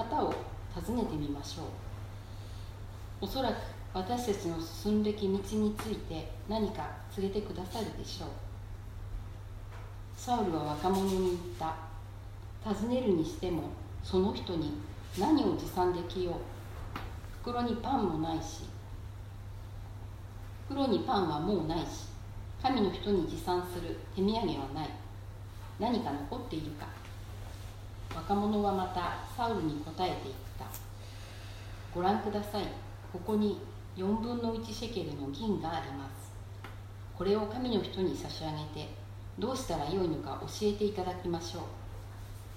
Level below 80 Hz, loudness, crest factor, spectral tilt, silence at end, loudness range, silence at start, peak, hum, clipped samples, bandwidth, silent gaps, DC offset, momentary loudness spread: -48 dBFS; -35 LUFS; 18 dB; -6 dB/octave; 0 s; 5 LU; 0 s; -16 dBFS; none; under 0.1%; 16 kHz; none; under 0.1%; 15 LU